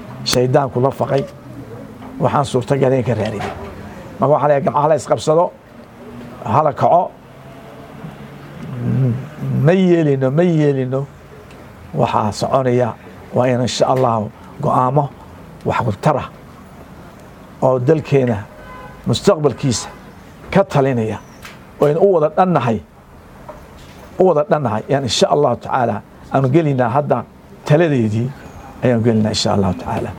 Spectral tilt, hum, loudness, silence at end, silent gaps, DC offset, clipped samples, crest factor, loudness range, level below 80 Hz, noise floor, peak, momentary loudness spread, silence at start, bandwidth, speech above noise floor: -6.5 dB/octave; none; -16 LUFS; 0 s; none; under 0.1%; under 0.1%; 18 dB; 3 LU; -46 dBFS; -40 dBFS; 0 dBFS; 20 LU; 0 s; 16.5 kHz; 25 dB